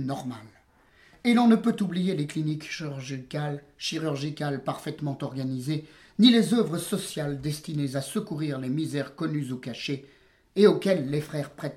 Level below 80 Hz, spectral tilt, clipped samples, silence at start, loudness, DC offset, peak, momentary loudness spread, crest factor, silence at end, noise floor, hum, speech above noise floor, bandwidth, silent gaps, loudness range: -64 dBFS; -6 dB/octave; under 0.1%; 0 s; -27 LUFS; under 0.1%; -6 dBFS; 14 LU; 22 dB; 0 s; -59 dBFS; none; 33 dB; 15.5 kHz; none; 6 LU